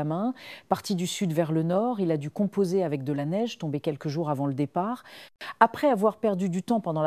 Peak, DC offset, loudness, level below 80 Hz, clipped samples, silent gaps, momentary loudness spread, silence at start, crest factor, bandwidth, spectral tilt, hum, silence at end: -4 dBFS; under 0.1%; -27 LUFS; -72 dBFS; under 0.1%; none; 8 LU; 0 s; 24 dB; 15.5 kHz; -6.5 dB/octave; none; 0 s